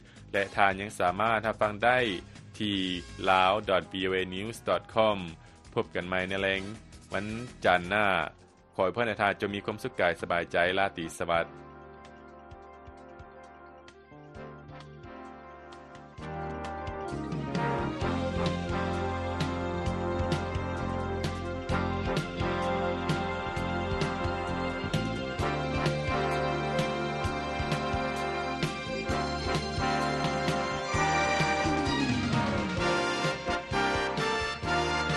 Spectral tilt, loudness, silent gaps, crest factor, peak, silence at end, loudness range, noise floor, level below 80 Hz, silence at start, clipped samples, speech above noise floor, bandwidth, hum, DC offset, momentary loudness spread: -5 dB/octave; -30 LUFS; none; 24 dB; -6 dBFS; 0 s; 11 LU; -51 dBFS; -46 dBFS; 0 s; under 0.1%; 22 dB; 12 kHz; none; under 0.1%; 20 LU